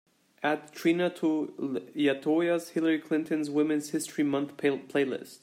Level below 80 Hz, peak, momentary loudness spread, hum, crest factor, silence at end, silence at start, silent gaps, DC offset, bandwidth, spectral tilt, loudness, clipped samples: -80 dBFS; -14 dBFS; 6 LU; none; 16 dB; 0.05 s; 0.4 s; none; under 0.1%; 16 kHz; -5 dB/octave; -29 LUFS; under 0.1%